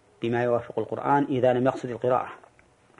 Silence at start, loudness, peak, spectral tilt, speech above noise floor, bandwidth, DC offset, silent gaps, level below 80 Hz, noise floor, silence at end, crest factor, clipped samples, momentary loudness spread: 0.2 s; -25 LUFS; -10 dBFS; -8 dB/octave; 34 dB; 10.5 kHz; under 0.1%; none; -64 dBFS; -59 dBFS; 0.6 s; 16 dB; under 0.1%; 7 LU